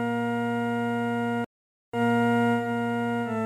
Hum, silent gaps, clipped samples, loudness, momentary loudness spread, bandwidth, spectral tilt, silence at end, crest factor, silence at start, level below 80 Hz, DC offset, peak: none; 1.46-1.92 s; under 0.1%; -26 LUFS; 7 LU; 12.5 kHz; -7 dB/octave; 0 s; 12 dB; 0 s; -70 dBFS; under 0.1%; -14 dBFS